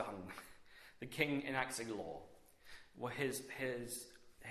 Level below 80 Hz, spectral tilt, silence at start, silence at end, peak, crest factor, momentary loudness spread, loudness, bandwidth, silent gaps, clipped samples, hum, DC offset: -72 dBFS; -4 dB/octave; 0 s; 0 s; -18 dBFS; 26 dB; 22 LU; -42 LUFS; 14 kHz; none; under 0.1%; none; under 0.1%